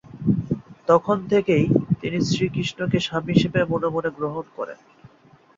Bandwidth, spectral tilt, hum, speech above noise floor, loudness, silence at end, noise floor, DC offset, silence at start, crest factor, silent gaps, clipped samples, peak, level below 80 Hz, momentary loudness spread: 7.8 kHz; -6.5 dB/octave; none; 33 dB; -22 LUFS; 0.5 s; -54 dBFS; under 0.1%; 0.15 s; 20 dB; none; under 0.1%; -2 dBFS; -52 dBFS; 10 LU